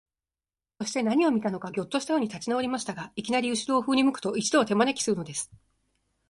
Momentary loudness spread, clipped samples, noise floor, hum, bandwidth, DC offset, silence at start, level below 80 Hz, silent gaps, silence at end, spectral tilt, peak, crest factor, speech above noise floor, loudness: 10 LU; under 0.1%; under -90 dBFS; none; 11.5 kHz; under 0.1%; 0.8 s; -66 dBFS; none; 0.85 s; -4 dB/octave; -8 dBFS; 18 dB; over 63 dB; -27 LUFS